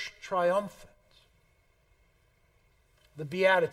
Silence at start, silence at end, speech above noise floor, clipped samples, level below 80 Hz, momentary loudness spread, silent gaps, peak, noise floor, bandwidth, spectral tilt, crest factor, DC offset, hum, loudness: 0 s; 0 s; 40 dB; under 0.1%; -68 dBFS; 19 LU; none; -10 dBFS; -68 dBFS; 14.5 kHz; -5 dB/octave; 22 dB; under 0.1%; none; -28 LUFS